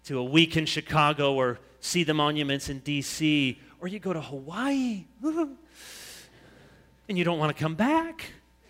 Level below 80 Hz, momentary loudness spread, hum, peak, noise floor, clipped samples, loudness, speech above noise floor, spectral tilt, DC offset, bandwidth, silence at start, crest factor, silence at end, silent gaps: -58 dBFS; 19 LU; none; -6 dBFS; -56 dBFS; under 0.1%; -27 LUFS; 29 dB; -4.5 dB/octave; under 0.1%; 16 kHz; 0.05 s; 22 dB; 0.35 s; none